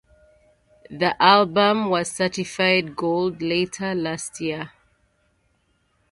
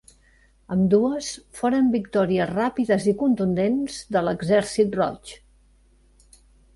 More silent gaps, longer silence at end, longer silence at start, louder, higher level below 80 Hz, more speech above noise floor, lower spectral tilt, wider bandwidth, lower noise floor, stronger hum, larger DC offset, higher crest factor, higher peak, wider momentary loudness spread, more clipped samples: neither; about the same, 1.45 s vs 1.4 s; first, 0.9 s vs 0.7 s; about the same, -21 LUFS vs -22 LUFS; second, -60 dBFS vs -54 dBFS; first, 45 dB vs 36 dB; second, -4 dB/octave vs -6 dB/octave; about the same, 11.5 kHz vs 11.5 kHz; first, -67 dBFS vs -58 dBFS; neither; neither; first, 22 dB vs 16 dB; first, 0 dBFS vs -8 dBFS; first, 13 LU vs 7 LU; neither